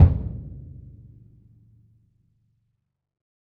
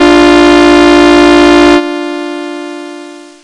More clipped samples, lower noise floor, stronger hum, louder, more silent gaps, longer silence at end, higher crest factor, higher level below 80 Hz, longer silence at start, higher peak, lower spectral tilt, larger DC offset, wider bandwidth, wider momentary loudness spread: second, under 0.1% vs 2%; first, -77 dBFS vs -28 dBFS; neither; second, -25 LUFS vs -4 LUFS; neither; first, 2.85 s vs 0.25 s; first, 24 dB vs 6 dB; about the same, -34 dBFS vs -30 dBFS; about the same, 0 s vs 0 s; about the same, -2 dBFS vs 0 dBFS; first, -12 dB/octave vs -4 dB/octave; neither; second, 2.5 kHz vs 11 kHz; first, 25 LU vs 17 LU